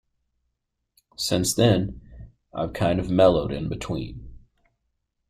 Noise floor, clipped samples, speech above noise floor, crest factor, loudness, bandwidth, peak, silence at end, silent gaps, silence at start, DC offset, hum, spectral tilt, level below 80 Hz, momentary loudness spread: -79 dBFS; under 0.1%; 56 dB; 20 dB; -23 LUFS; 16 kHz; -6 dBFS; 0.9 s; none; 1.2 s; under 0.1%; none; -5.5 dB/octave; -44 dBFS; 19 LU